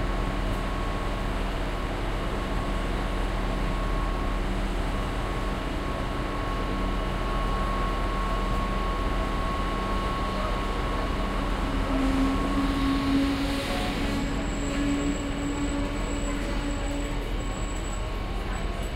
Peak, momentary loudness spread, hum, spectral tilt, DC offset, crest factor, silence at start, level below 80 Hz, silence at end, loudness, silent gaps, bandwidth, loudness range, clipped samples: -12 dBFS; 5 LU; none; -5.5 dB/octave; under 0.1%; 14 dB; 0 s; -30 dBFS; 0 s; -29 LUFS; none; 14 kHz; 4 LU; under 0.1%